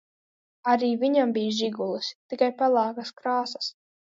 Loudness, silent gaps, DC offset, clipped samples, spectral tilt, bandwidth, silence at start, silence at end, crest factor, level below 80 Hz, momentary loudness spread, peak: -26 LUFS; 2.15-2.29 s; under 0.1%; under 0.1%; -4.5 dB/octave; 7.8 kHz; 0.65 s; 0.35 s; 18 dB; -80 dBFS; 10 LU; -8 dBFS